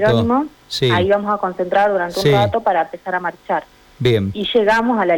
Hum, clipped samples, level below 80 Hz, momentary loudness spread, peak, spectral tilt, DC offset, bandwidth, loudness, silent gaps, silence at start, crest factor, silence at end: none; under 0.1%; -46 dBFS; 8 LU; -6 dBFS; -6 dB/octave; under 0.1%; 18.5 kHz; -17 LUFS; none; 0 s; 12 dB; 0 s